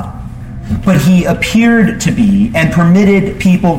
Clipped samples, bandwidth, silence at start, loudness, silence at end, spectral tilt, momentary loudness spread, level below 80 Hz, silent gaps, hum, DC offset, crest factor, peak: under 0.1%; 16 kHz; 0 s; -10 LUFS; 0 s; -6.5 dB/octave; 15 LU; -30 dBFS; none; none; under 0.1%; 10 dB; 0 dBFS